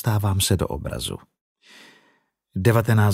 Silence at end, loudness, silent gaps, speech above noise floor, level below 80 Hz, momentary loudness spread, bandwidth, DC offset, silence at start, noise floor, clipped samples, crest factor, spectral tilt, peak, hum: 0 s; -22 LUFS; 1.41-1.56 s; 44 dB; -44 dBFS; 14 LU; 16 kHz; under 0.1%; 0.05 s; -65 dBFS; under 0.1%; 18 dB; -5.5 dB/octave; -4 dBFS; none